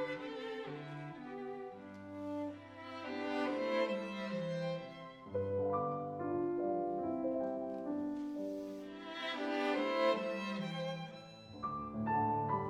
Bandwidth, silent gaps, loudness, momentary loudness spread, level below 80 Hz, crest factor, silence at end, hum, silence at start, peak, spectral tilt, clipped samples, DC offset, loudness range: 11 kHz; none; -39 LUFS; 12 LU; -72 dBFS; 18 dB; 0 s; none; 0 s; -20 dBFS; -6.5 dB/octave; under 0.1%; under 0.1%; 3 LU